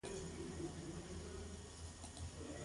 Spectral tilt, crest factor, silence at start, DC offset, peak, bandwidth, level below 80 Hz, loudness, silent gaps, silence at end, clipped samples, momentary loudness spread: -4.5 dB/octave; 14 dB; 0.05 s; under 0.1%; -34 dBFS; 11.5 kHz; -56 dBFS; -50 LUFS; none; 0 s; under 0.1%; 4 LU